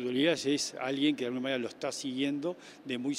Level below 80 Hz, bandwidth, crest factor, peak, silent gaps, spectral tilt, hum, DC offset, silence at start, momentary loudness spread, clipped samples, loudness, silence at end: -78 dBFS; 14 kHz; 18 dB; -14 dBFS; none; -3.5 dB/octave; none; under 0.1%; 0 s; 8 LU; under 0.1%; -32 LUFS; 0 s